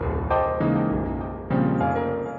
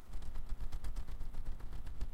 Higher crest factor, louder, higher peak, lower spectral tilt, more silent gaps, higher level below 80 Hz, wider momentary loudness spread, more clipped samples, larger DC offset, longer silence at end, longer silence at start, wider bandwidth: about the same, 14 dB vs 10 dB; first, -24 LUFS vs -49 LUFS; first, -10 dBFS vs -26 dBFS; first, -10.5 dB/octave vs -6 dB/octave; neither; about the same, -38 dBFS vs -40 dBFS; about the same, 5 LU vs 3 LU; neither; neither; about the same, 0 s vs 0 s; about the same, 0 s vs 0 s; first, 7.2 kHz vs 5.6 kHz